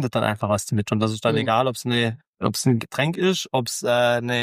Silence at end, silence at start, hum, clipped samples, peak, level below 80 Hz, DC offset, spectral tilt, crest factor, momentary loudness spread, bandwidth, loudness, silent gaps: 0 s; 0 s; none; under 0.1%; -4 dBFS; -60 dBFS; under 0.1%; -5 dB/octave; 18 dB; 4 LU; 15.5 kHz; -22 LUFS; 2.27-2.33 s